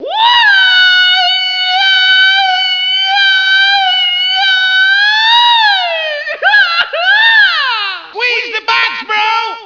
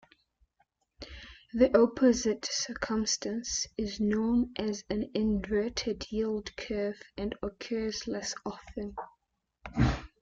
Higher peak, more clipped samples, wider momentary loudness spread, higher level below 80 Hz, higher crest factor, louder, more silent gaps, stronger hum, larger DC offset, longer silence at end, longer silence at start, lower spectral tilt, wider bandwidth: first, 0 dBFS vs -10 dBFS; first, 0.3% vs under 0.1%; second, 7 LU vs 15 LU; second, -60 dBFS vs -48 dBFS; second, 10 dB vs 22 dB; first, -8 LUFS vs -31 LUFS; neither; neither; neither; second, 0 s vs 0.15 s; second, 0 s vs 1 s; second, 2 dB/octave vs -4.5 dB/octave; second, 5.4 kHz vs 8.6 kHz